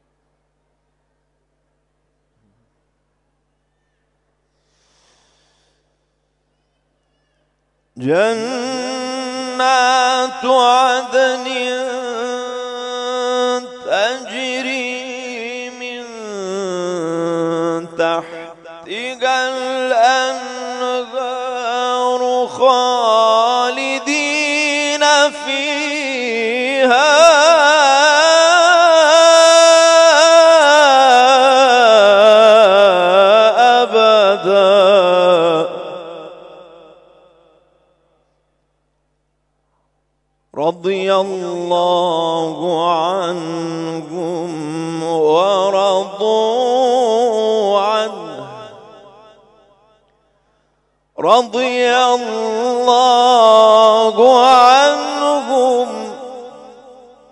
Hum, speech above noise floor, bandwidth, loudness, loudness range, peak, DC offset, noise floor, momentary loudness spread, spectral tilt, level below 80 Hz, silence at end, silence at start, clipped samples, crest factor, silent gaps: 50 Hz at -65 dBFS; 54 dB; 11 kHz; -13 LUFS; 13 LU; 0 dBFS; under 0.1%; -66 dBFS; 16 LU; -2.5 dB/octave; -66 dBFS; 0.65 s; 7.95 s; under 0.1%; 14 dB; none